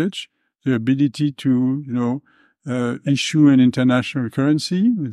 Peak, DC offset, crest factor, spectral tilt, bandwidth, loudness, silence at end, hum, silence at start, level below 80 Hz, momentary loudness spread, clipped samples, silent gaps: -4 dBFS; under 0.1%; 16 dB; -6.5 dB/octave; 11.5 kHz; -19 LUFS; 0 s; none; 0 s; -64 dBFS; 12 LU; under 0.1%; none